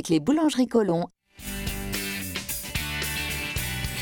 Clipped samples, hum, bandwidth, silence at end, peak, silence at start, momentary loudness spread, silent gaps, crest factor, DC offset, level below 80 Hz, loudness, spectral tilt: under 0.1%; none; 17.5 kHz; 0 s; -8 dBFS; 0 s; 10 LU; none; 18 dB; under 0.1%; -42 dBFS; -27 LUFS; -4 dB/octave